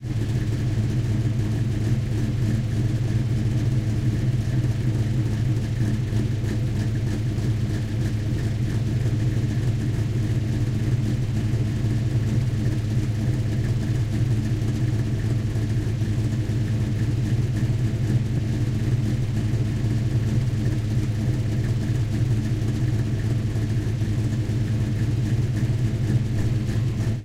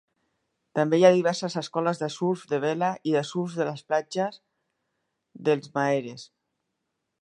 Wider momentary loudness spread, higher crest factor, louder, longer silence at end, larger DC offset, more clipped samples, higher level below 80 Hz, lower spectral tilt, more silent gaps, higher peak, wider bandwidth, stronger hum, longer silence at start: second, 2 LU vs 11 LU; second, 12 dB vs 22 dB; about the same, -24 LUFS vs -26 LUFS; second, 0 s vs 1 s; neither; neither; first, -34 dBFS vs -78 dBFS; first, -7.5 dB/octave vs -6 dB/octave; neither; second, -10 dBFS vs -4 dBFS; about the same, 11.5 kHz vs 11 kHz; neither; second, 0 s vs 0.75 s